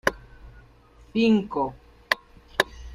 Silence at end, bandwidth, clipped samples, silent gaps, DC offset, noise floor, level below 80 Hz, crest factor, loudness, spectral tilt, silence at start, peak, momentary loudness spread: 0 s; 15 kHz; under 0.1%; none; under 0.1%; -53 dBFS; -48 dBFS; 26 dB; -26 LUFS; -4.5 dB/octave; 0.05 s; -2 dBFS; 10 LU